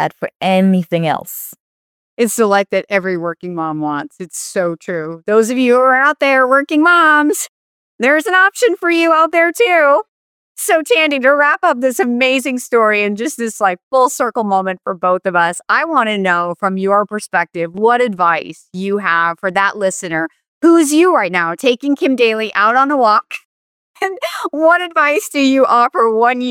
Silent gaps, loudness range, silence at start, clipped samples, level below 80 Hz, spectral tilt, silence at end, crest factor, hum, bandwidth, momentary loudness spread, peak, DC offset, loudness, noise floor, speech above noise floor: 0.36-0.40 s, 1.60-2.17 s, 7.49-7.99 s, 10.08-10.55 s, 13.83-13.91 s, 20.48-20.61 s, 23.45-23.94 s; 4 LU; 0 s; under 0.1%; -68 dBFS; -4 dB/octave; 0 s; 14 dB; none; 19 kHz; 10 LU; 0 dBFS; under 0.1%; -14 LUFS; under -90 dBFS; over 76 dB